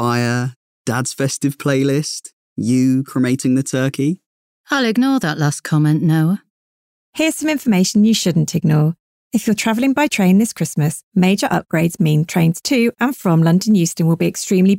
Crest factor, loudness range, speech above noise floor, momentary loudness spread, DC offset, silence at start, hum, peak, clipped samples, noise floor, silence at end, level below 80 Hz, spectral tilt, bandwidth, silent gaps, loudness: 10 dB; 3 LU; over 74 dB; 7 LU; under 0.1%; 0 s; none; -6 dBFS; under 0.1%; under -90 dBFS; 0 s; -58 dBFS; -5.5 dB/octave; 16.5 kHz; 0.56-0.85 s, 2.33-2.56 s, 4.26-4.64 s, 6.50-7.13 s, 9.00-9.31 s, 11.03-11.12 s; -17 LUFS